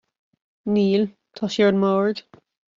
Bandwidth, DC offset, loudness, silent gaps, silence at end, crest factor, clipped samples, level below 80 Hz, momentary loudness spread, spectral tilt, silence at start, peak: 7.4 kHz; under 0.1%; -21 LUFS; none; 0.6 s; 16 dB; under 0.1%; -66 dBFS; 13 LU; -5.5 dB/octave; 0.65 s; -8 dBFS